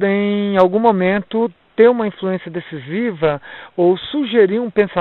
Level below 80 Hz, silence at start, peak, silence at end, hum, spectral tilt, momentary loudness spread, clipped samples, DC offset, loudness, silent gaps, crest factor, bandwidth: -56 dBFS; 0 s; 0 dBFS; 0 s; none; -9 dB/octave; 12 LU; under 0.1%; under 0.1%; -16 LUFS; none; 16 dB; 4.7 kHz